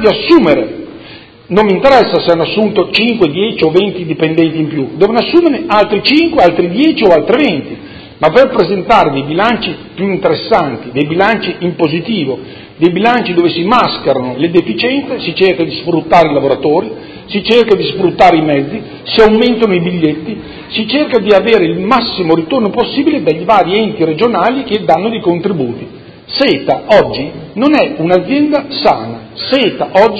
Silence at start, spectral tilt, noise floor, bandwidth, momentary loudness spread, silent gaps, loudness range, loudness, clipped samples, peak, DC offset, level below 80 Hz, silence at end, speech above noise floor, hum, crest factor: 0 s; -7 dB/octave; -34 dBFS; 8 kHz; 10 LU; none; 3 LU; -11 LUFS; 0.9%; 0 dBFS; under 0.1%; -42 dBFS; 0 s; 23 dB; none; 10 dB